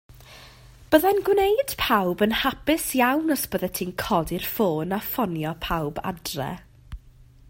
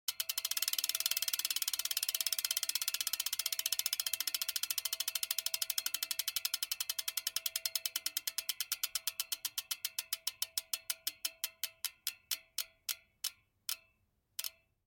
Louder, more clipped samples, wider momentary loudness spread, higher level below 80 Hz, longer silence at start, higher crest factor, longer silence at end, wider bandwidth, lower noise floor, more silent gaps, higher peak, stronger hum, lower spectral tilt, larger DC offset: first, -24 LUFS vs -36 LUFS; neither; about the same, 10 LU vs 9 LU; first, -46 dBFS vs -82 dBFS; about the same, 0.15 s vs 0.1 s; second, 20 dB vs 26 dB; about the same, 0.25 s vs 0.35 s; about the same, 16.5 kHz vs 17 kHz; second, -50 dBFS vs -77 dBFS; neither; first, -4 dBFS vs -12 dBFS; neither; first, -4.5 dB/octave vs 4.5 dB/octave; neither